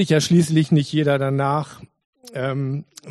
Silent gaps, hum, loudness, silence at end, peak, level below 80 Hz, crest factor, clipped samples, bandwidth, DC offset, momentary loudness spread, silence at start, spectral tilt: 2.05-2.13 s; none; -20 LUFS; 0 s; -4 dBFS; -60 dBFS; 16 dB; under 0.1%; 12.5 kHz; under 0.1%; 13 LU; 0 s; -6 dB/octave